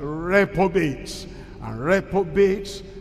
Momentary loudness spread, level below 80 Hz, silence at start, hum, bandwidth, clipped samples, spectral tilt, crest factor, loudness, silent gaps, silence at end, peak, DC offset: 15 LU; -42 dBFS; 0 s; none; 14 kHz; under 0.1%; -6 dB/octave; 18 dB; -21 LUFS; none; 0 s; -6 dBFS; under 0.1%